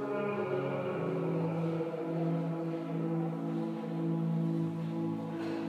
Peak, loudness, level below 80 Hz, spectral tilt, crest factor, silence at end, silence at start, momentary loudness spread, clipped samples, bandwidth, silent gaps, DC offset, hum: -22 dBFS; -34 LUFS; -84 dBFS; -9.5 dB/octave; 12 dB; 0 s; 0 s; 4 LU; under 0.1%; 5.8 kHz; none; under 0.1%; none